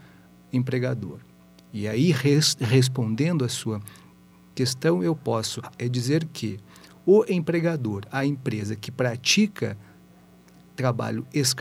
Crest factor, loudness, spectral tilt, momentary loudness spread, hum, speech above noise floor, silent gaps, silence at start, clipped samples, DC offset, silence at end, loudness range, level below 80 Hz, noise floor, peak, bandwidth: 18 dB; -24 LUFS; -5 dB/octave; 13 LU; none; 28 dB; none; 0.55 s; under 0.1%; under 0.1%; 0 s; 3 LU; -64 dBFS; -52 dBFS; -6 dBFS; 16 kHz